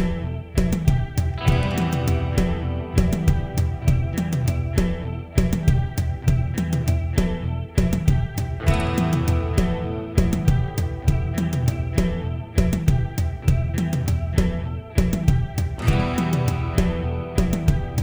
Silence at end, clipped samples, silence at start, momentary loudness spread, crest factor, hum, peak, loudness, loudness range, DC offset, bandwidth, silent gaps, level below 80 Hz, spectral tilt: 0 s; under 0.1%; 0 s; 4 LU; 16 dB; none; -4 dBFS; -23 LUFS; 1 LU; under 0.1%; over 20 kHz; none; -26 dBFS; -7 dB/octave